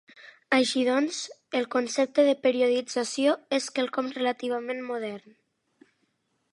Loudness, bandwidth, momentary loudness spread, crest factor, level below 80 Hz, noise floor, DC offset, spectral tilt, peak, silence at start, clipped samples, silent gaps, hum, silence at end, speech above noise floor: -26 LUFS; 11.5 kHz; 10 LU; 20 dB; -84 dBFS; -74 dBFS; under 0.1%; -2.5 dB/octave; -8 dBFS; 0.25 s; under 0.1%; none; none; 1.35 s; 48 dB